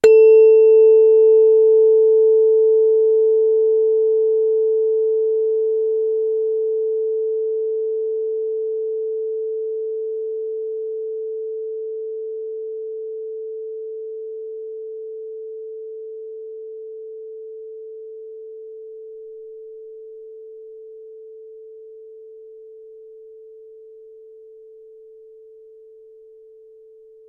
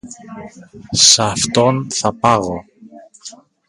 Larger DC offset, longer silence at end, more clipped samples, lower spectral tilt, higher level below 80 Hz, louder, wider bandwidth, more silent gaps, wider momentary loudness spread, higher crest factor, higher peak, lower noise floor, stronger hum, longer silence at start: neither; first, 3.7 s vs 0.35 s; neither; first, -4.5 dB/octave vs -2.5 dB/octave; second, -70 dBFS vs -48 dBFS; second, -17 LUFS vs -13 LUFS; second, 7.6 kHz vs 16 kHz; neither; about the same, 25 LU vs 26 LU; about the same, 16 dB vs 18 dB; about the same, -2 dBFS vs 0 dBFS; first, -46 dBFS vs -41 dBFS; neither; about the same, 0.05 s vs 0.05 s